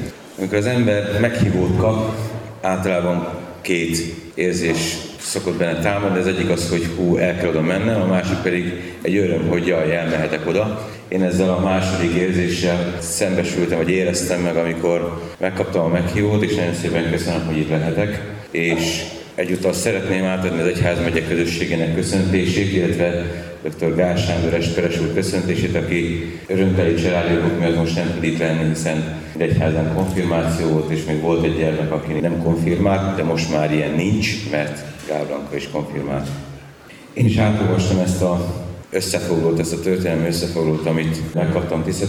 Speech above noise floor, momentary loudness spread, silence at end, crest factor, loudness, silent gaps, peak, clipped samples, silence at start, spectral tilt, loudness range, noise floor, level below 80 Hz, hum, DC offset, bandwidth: 22 dB; 7 LU; 0 s; 18 dB; -19 LUFS; none; -2 dBFS; under 0.1%; 0 s; -6 dB/octave; 2 LU; -40 dBFS; -42 dBFS; none; under 0.1%; 16 kHz